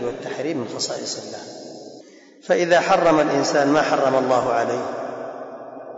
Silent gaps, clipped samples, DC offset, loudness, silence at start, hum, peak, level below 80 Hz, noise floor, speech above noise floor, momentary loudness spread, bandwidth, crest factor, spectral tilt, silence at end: none; under 0.1%; under 0.1%; -20 LUFS; 0 s; none; -6 dBFS; -62 dBFS; -45 dBFS; 26 dB; 20 LU; 8 kHz; 14 dB; -4 dB/octave; 0 s